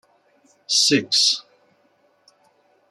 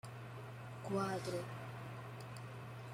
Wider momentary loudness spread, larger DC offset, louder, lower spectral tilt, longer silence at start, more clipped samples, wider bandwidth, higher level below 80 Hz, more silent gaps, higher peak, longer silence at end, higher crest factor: second, 5 LU vs 11 LU; neither; first, -17 LUFS vs -45 LUFS; second, -1.5 dB/octave vs -6 dB/octave; first, 0.7 s vs 0.05 s; neither; second, 14 kHz vs 16.5 kHz; about the same, -74 dBFS vs -74 dBFS; neither; first, -4 dBFS vs -26 dBFS; first, 1.5 s vs 0 s; about the same, 20 dB vs 18 dB